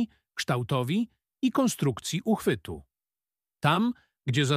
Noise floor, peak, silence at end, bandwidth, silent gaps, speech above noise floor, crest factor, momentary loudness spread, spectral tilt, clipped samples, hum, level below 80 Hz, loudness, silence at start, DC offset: under -90 dBFS; -8 dBFS; 0 s; 15.5 kHz; none; over 63 dB; 20 dB; 10 LU; -5.5 dB/octave; under 0.1%; none; -60 dBFS; -28 LUFS; 0 s; under 0.1%